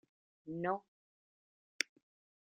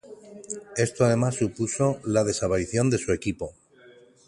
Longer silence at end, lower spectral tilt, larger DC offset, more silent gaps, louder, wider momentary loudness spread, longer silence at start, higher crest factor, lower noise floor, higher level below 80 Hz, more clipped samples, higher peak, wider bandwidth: about the same, 0.65 s vs 0.75 s; second, -2.5 dB/octave vs -5.5 dB/octave; neither; first, 0.88-1.79 s vs none; second, -41 LUFS vs -25 LUFS; second, 9 LU vs 15 LU; first, 0.45 s vs 0.05 s; first, 32 dB vs 18 dB; first, under -90 dBFS vs -53 dBFS; second, -86 dBFS vs -50 dBFS; neither; second, -14 dBFS vs -8 dBFS; second, 7.6 kHz vs 11.5 kHz